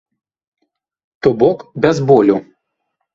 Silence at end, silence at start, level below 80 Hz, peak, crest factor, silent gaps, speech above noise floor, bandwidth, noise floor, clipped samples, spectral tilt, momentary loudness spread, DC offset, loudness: 0.7 s; 1.25 s; -52 dBFS; 0 dBFS; 16 dB; none; 61 dB; 7.6 kHz; -73 dBFS; under 0.1%; -7.5 dB/octave; 7 LU; under 0.1%; -14 LUFS